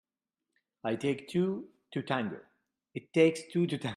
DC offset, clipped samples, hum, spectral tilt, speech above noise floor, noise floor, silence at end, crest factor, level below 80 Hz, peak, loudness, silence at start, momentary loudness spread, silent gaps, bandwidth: under 0.1%; under 0.1%; none; -6.5 dB/octave; 58 dB; -89 dBFS; 0 s; 22 dB; -76 dBFS; -12 dBFS; -32 LUFS; 0.85 s; 15 LU; none; 12.5 kHz